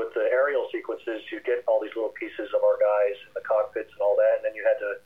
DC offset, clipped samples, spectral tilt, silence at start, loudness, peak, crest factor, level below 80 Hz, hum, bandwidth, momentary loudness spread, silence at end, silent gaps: 0.1%; under 0.1%; -5 dB/octave; 0 s; -26 LUFS; -12 dBFS; 14 dB; -72 dBFS; none; 3.9 kHz; 10 LU; 0.1 s; none